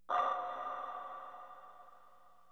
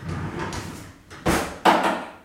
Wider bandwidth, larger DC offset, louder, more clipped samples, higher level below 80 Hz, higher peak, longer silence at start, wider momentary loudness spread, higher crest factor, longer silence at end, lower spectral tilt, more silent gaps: second, 8.8 kHz vs 16.5 kHz; neither; second, -40 LUFS vs -23 LUFS; neither; second, -80 dBFS vs -42 dBFS; second, -22 dBFS vs -2 dBFS; about the same, 0.1 s vs 0 s; first, 23 LU vs 19 LU; about the same, 20 dB vs 22 dB; first, 0.35 s vs 0.05 s; second, -3 dB/octave vs -4.5 dB/octave; neither